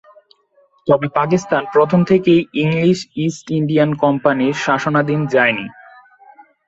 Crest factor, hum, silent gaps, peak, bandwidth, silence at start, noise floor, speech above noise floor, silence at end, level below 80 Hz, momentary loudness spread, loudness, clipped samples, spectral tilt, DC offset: 16 dB; none; none; -2 dBFS; 8 kHz; 0.85 s; -56 dBFS; 41 dB; 0.95 s; -56 dBFS; 7 LU; -16 LUFS; under 0.1%; -6.5 dB/octave; under 0.1%